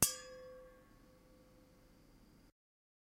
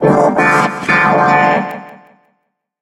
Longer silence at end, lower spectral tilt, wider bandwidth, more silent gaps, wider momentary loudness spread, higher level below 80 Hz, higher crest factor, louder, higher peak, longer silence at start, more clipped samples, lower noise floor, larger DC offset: about the same, 0.75 s vs 0.85 s; second, -1.5 dB/octave vs -6 dB/octave; first, 16 kHz vs 13.5 kHz; neither; first, 17 LU vs 9 LU; second, -68 dBFS vs -50 dBFS; first, 40 dB vs 14 dB; second, -42 LUFS vs -11 LUFS; second, -6 dBFS vs 0 dBFS; about the same, 0 s vs 0 s; neither; about the same, -65 dBFS vs -67 dBFS; neither